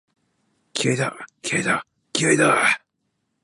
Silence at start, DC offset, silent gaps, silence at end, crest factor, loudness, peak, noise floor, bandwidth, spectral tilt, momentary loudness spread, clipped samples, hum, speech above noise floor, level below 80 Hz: 0.75 s; under 0.1%; none; 0.65 s; 20 dB; -21 LUFS; -4 dBFS; -74 dBFS; 11.5 kHz; -3.5 dB/octave; 11 LU; under 0.1%; none; 54 dB; -68 dBFS